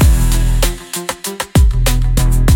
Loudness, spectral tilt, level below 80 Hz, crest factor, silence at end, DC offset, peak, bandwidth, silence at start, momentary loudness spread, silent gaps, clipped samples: -15 LUFS; -5 dB/octave; -14 dBFS; 10 dB; 0 s; under 0.1%; 0 dBFS; 17.5 kHz; 0 s; 9 LU; none; under 0.1%